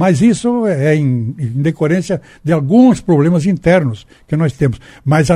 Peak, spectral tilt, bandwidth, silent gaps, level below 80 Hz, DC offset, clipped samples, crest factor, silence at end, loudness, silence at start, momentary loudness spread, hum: 0 dBFS; -7.5 dB/octave; 11.5 kHz; none; -40 dBFS; under 0.1%; under 0.1%; 12 dB; 0 s; -14 LUFS; 0 s; 11 LU; none